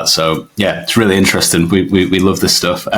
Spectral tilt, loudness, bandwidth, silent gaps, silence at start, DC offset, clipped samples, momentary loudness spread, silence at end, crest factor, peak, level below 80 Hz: -3.5 dB/octave; -12 LUFS; over 20 kHz; none; 0 s; under 0.1%; under 0.1%; 6 LU; 0 s; 12 dB; 0 dBFS; -44 dBFS